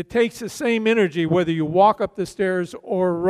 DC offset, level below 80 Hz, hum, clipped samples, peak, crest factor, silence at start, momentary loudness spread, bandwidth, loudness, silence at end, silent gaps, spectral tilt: under 0.1%; -56 dBFS; none; under 0.1%; -4 dBFS; 16 dB; 0 s; 9 LU; 15 kHz; -21 LUFS; 0 s; none; -6 dB/octave